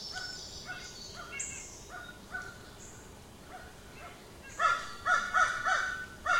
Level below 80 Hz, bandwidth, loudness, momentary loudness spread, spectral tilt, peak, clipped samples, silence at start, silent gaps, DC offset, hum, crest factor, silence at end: -58 dBFS; 16.5 kHz; -33 LUFS; 21 LU; -1.5 dB/octave; -14 dBFS; under 0.1%; 0 s; none; under 0.1%; none; 20 dB; 0 s